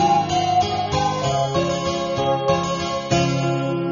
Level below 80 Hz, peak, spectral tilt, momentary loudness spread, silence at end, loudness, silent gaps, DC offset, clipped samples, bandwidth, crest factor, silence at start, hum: -44 dBFS; -6 dBFS; -4.5 dB/octave; 4 LU; 0 s; -21 LUFS; none; under 0.1%; under 0.1%; 7.4 kHz; 14 dB; 0 s; none